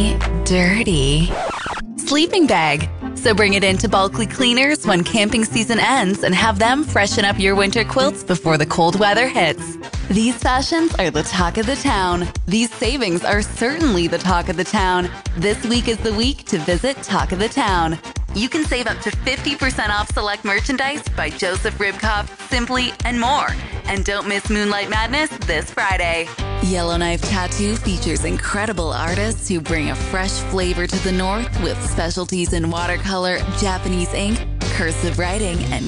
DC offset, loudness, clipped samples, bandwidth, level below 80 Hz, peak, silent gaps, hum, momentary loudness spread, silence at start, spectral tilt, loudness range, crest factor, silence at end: under 0.1%; -18 LUFS; under 0.1%; 11.5 kHz; -28 dBFS; -4 dBFS; none; none; 7 LU; 0 s; -4 dB/octave; 5 LU; 14 dB; 0 s